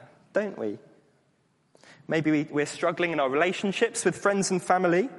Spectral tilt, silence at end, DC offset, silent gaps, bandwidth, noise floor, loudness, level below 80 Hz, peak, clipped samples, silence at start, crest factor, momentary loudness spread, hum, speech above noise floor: -4.5 dB/octave; 0 s; under 0.1%; none; 11.5 kHz; -68 dBFS; -26 LUFS; -72 dBFS; -8 dBFS; under 0.1%; 0 s; 20 dB; 8 LU; none; 42 dB